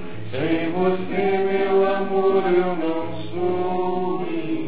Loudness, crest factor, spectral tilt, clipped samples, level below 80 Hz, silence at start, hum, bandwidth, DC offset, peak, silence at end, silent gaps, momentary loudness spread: -22 LUFS; 14 dB; -11 dB/octave; under 0.1%; -58 dBFS; 0 s; none; 4 kHz; 4%; -8 dBFS; 0 s; none; 7 LU